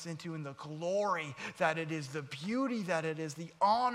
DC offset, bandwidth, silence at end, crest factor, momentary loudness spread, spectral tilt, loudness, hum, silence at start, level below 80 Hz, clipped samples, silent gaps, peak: under 0.1%; 14.5 kHz; 0 s; 16 dB; 10 LU; -5 dB/octave; -35 LUFS; none; 0 s; -78 dBFS; under 0.1%; none; -18 dBFS